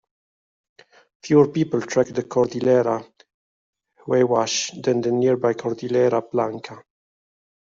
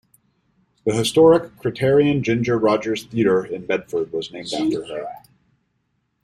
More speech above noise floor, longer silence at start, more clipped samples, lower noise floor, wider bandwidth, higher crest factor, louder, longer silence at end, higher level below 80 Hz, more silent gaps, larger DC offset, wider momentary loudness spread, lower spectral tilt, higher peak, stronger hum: first, over 70 dB vs 51 dB; first, 1.25 s vs 0.85 s; neither; first, under -90 dBFS vs -70 dBFS; second, 7.8 kHz vs 13 kHz; about the same, 20 dB vs 18 dB; about the same, -21 LUFS vs -20 LUFS; second, 0.9 s vs 1.05 s; second, -64 dBFS vs -54 dBFS; first, 3.34-3.73 s vs none; neither; second, 9 LU vs 13 LU; about the same, -5.5 dB/octave vs -6 dB/octave; about the same, -4 dBFS vs -2 dBFS; neither